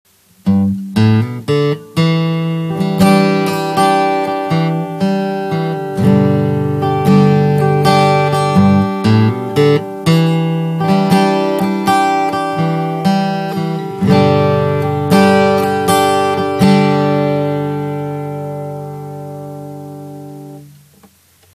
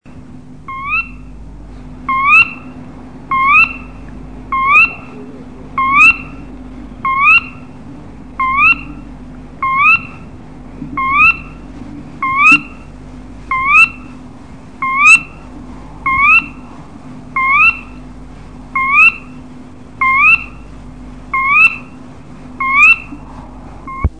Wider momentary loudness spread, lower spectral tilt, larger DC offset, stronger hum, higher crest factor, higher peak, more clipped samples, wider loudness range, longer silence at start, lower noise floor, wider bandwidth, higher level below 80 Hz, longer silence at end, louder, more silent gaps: second, 13 LU vs 25 LU; first, -7 dB/octave vs -3 dB/octave; second, under 0.1% vs 1%; neither; about the same, 14 dB vs 14 dB; about the same, 0 dBFS vs 0 dBFS; neither; about the same, 5 LU vs 3 LU; first, 0.45 s vs 0.15 s; first, -48 dBFS vs -34 dBFS; first, 15 kHz vs 10 kHz; second, -50 dBFS vs -34 dBFS; first, 0.9 s vs 0.1 s; second, -13 LUFS vs -9 LUFS; neither